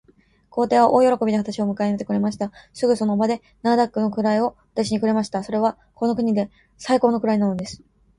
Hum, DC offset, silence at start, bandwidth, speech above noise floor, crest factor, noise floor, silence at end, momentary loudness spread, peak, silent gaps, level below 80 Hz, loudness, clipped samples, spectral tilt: none; under 0.1%; 0.55 s; 11.5 kHz; 35 dB; 18 dB; -55 dBFS; 0.45 s; 11 LU; -4 dBFS; none; -58 dBFS; -21 LUFS; under 0.1%; -6.5 dB/octave